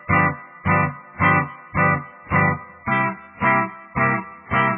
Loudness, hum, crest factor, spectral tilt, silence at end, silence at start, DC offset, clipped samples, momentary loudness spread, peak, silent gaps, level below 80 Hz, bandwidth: -21 LUFS; none; 16 dB; -10.5 dB/octave; 0 s; 0.05 s; under 0.1%; under 0.1%; 8 LU; -4 dBFS; none; -48 dBFS; 3.7 kHz